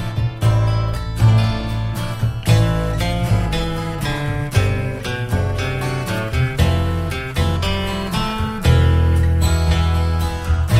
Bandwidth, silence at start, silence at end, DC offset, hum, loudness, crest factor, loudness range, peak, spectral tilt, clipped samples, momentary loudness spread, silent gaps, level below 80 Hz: 15.5 kHz; 0 s; 0 s; under 0.1%; none; -19 LUFS; 14 dB; 3 LU; -2 dBFS; -6 dB/octave; under 0.1%; 7 LU; none; -24 dBFS